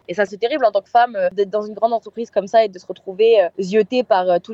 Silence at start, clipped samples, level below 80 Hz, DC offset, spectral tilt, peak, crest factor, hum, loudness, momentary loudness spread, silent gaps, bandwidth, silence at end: 0.1 s; under 0.1%; -70 dBFS; under 0.1%; -5.5 dB/octave; -2 dBFS; 14 dB; none; -18 LUFS; 8 LU; none; 7.8 kHz; 0 s